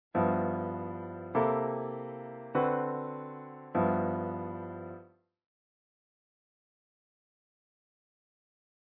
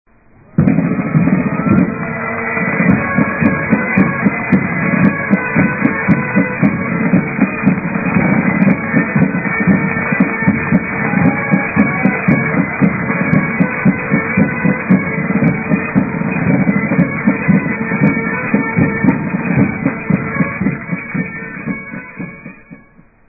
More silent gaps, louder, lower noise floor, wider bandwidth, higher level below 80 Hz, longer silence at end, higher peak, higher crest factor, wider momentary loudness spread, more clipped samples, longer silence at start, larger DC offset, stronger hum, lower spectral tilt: neither; second, -33 LUFS vs -14 LUFS; first, -56 dBFS vs -45 dBFS; first, 4 kHz vs 2.7 kHz; second, -74 dBFS vs -40 dBFS; first, 3.9 s vs 0.55 s; second, -14 dBFS vs 0 dBFS; first, 20 dB vs 14 dB; first, 14 LU vs 6 LU; neither; second, 0.15 s vs 0.6 s; neither; neither; second, -8 dB/octave vs -12.5 dB/octave